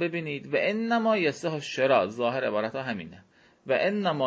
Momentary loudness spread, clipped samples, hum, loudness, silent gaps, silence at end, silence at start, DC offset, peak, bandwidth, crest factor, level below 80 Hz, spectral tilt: 10 LU; under 0.1%; none; -27 LUFS; none; 0 s; 0 s; under 0.1%; -10 dBFS; 8 kHz; 18 dB; -70 dBFS; -5.5 dB/octave